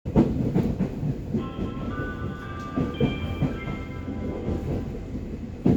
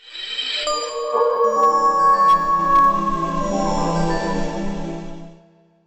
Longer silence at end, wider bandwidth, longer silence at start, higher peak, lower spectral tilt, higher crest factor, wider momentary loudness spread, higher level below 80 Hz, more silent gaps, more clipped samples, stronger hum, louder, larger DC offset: second, 0 s vs 0.5 s; first, 19 kHz vs 15.5 kHz; about the same, 0.05 s vs 0.05 s; about the same, -8 dBFS vs -6 dBFS; first, -8.5 dB/octave vs -4.5 dB/octave; first, 20 dB vs 12 dB; second, 9 LU vs 12 LU; about the same, -38 dBFS vs -34 dBFS; neither; neither; neither; second, -29 LUFS vs -18 LUFS; neither